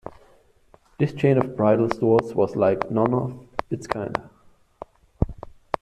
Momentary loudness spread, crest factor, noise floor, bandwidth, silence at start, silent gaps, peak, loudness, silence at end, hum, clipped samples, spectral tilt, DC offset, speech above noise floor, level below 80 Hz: 23 LU; 22 dB; -57 dBFS; 11 kHz; 0.05 s; none; -2 dBFS; -23 LUFS; 0.3 s; none; under 0.1%; -8.5 dB/octave; under 0.1%; 35 dB; -44 dBFS